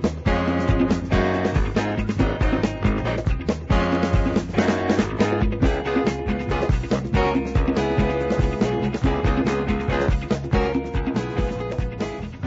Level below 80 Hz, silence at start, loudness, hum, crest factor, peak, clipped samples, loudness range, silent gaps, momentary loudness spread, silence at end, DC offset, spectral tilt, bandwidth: -28 dBFS; 0 s; -22 LUFS; none; 16 dB; -6 dBFS; under 0.1%; 1 LU; none; 4 LU; 0 s; under 0.1%; -7 dB/octave; 8 kHz